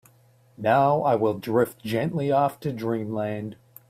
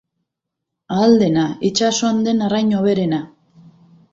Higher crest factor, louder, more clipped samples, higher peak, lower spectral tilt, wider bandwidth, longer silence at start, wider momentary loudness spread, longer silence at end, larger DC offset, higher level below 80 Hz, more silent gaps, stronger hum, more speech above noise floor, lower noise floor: about the same, 18 dB vs 16 dB; second, -24 LUFS vs -17 LUFS; neither; second, -8 dBFS vs -2 dBFS; first, -7.5 dB/octave vs -5 dB/octave; first, 16 kHz vs 7.8 kHz; second, 0.6 s vs 0.9 s; about the same, 10 LU vs 9 LU; second, 0.35 s vs 0.85 s; neither; second, -64 dBFS vs -58 dBFS; neither; neither; second, 34 dB vs 64 dB; second, -58 dBFS vs -80 dBFS